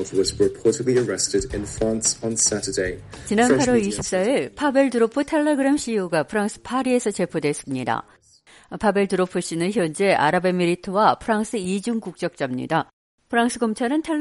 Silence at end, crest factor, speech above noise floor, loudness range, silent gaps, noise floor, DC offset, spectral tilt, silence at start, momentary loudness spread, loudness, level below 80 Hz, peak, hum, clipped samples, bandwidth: 0 s; 18 dB; 31 dB; 4 LU; 12.93-13.18 s; -52 dBFS; under 0.1%; -4 dB/octave; 0 s; 7 LU; -22 LUFS; -48 dBFS; -4 dBFS; none; under 0.1%; 11.5 kHz